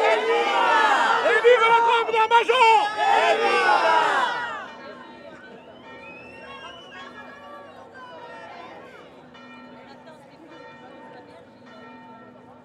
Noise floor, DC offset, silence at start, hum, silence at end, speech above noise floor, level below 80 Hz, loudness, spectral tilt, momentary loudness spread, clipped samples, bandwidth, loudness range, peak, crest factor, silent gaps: -46 dBFS; under 0.1%; 0 s; none; 0.5 s; 28 dB; -74 dBFS; -19 LUFS; -2 dB/octave; 25 LU; under 0.1%; 12 kHz; 25 LU; -4 dBFS; 18 dB; none